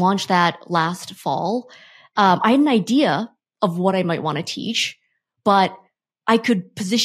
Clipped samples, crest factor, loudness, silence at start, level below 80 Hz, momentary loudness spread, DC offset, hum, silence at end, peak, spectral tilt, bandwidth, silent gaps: under 0.1%; 18 dB; -20 LUFS; 0 s; -72 dBFS; 9 LU; under 0.1%; none; 0 s; -2 dBFS; -5 dB/octave; 15 kHz; none